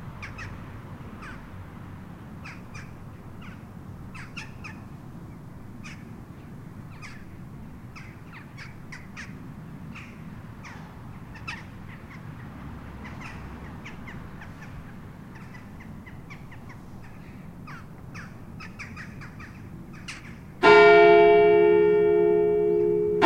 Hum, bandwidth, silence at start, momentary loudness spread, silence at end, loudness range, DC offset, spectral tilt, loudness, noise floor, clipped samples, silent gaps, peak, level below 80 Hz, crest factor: none; 9 kHz; 0 s; 25 LU; 0 s; 24 LU; under 0.1%; -6.5 dB/octave; -18 LUFS; -43 dBFS; under 0.1%; none; -2 dBFS; -50 dBFS; 24 dB